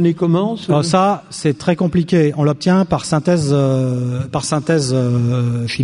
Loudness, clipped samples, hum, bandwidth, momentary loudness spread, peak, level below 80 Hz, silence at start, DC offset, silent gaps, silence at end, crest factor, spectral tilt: -16 LUFS; under 0.1%; none; 11 kHz; 5 LU; 0 dBFS; -46 dBFS; 0 s; under 0.1%; none; 0 s; 14 dB; -6.5 dB/octave